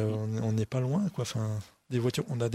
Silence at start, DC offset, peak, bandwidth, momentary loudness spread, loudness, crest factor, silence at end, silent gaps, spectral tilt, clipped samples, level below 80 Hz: 0 s; under 0.1%; -16 dBFS; 13.5 kHz; 5 LU; -32 LUFS; 14 dB; 0 s; none; -6.5 dB/octave; under 0.1%; -62 dBFS